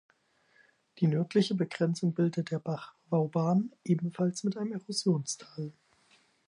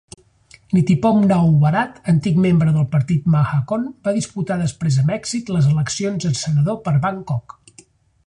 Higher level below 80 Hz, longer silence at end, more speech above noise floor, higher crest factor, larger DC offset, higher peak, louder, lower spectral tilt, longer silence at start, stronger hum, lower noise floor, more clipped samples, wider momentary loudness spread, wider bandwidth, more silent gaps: second, -80 dBFS vs -48 dBFS; about the same, 0.75 s vs 0.85 s; first, 38 dB vs 33 dB; about the same, 18 dB vs 14 dB; neither; second, -14 dBFS vs -4 dBFS; second, -31 LUFS vs -18 LUFS; about the same, -6.5 dB/octave vs -7 dB/octave; first, 0.95 s vs 0.7 s; neither; first, -68 dBFS vs -50 dBFS; neither; about the same, 10 LU vs 8 LU; about the same, 11 kHz vs 10.5 kHz; neither